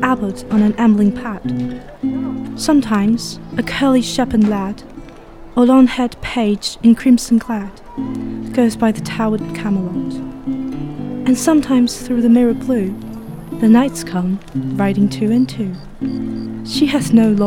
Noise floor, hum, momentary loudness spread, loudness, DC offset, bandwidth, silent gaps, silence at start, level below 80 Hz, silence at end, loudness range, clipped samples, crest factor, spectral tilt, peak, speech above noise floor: -35 dBFS; none; 13 LU; -16 LUFS; under 0.1%; 15.5 kHz; none; 0 s; -40 dBFS; 0 s; 4 LU; under 0.1%; 16 dB; -6 dB/octave; 0 dBFS; 21 dB